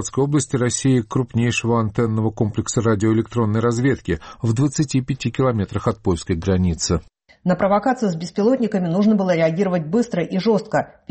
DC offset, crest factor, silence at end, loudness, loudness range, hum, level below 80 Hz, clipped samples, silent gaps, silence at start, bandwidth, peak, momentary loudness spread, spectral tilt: under 0.1%; 12 dB; 0.2 s; -20 LUFS; 2 LU; none; -42 dBFS; under 0.1%; none; 0 s; 8.8 kHz; -8 dBFS; 5 LU; -6 dB/octave